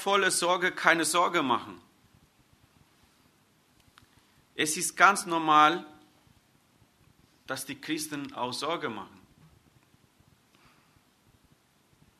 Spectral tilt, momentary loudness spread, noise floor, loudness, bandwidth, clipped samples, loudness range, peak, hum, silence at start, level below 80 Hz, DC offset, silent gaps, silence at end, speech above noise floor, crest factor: -2 dB/octave; 16 LU; -65 dBFS; -26 LUFS; 13.5 kHz; under 0.1%; 12 LU; -4 dBFS; none; 0 s; -74 dBFS; under 0.1%; none; 3.15 s; 39 dB; 26 dB